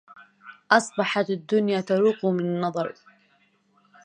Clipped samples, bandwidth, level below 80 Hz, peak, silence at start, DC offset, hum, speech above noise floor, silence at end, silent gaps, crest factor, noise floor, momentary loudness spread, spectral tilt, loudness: under 0.1%; 10 kHz; -76 dBFS; -4 dBFS; 0.15 s; under 0.1%; none; 41 dB; 1.15 s; none; 22 dB; -64 dBFS; 6 LU; -5 dB/octave; -24 LUFS